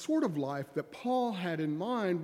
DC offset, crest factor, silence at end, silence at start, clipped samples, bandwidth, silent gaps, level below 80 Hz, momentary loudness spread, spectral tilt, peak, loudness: under 0.1%; 12 dB; 0 s; 0 s; under 0.1%; 14.5 kHz; none; -80 dBFS; 6 LU; -6.5 dB/octave; -20 dBFS; -34 LUFS